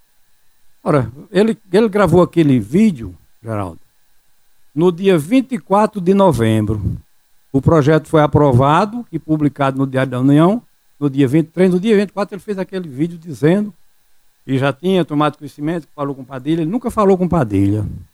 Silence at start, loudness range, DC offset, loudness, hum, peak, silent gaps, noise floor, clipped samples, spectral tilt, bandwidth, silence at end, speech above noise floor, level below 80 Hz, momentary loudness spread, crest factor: 0.85 s; 5 LU; under 0.1%; -16 LUFS; none; -2 dBFS; none; -56 dBFS; under 0.1%; -8 dB/octave; 15.5 kHz; 0.1 s; 41 dB; -42 dBFS; 13 LU; 14 dB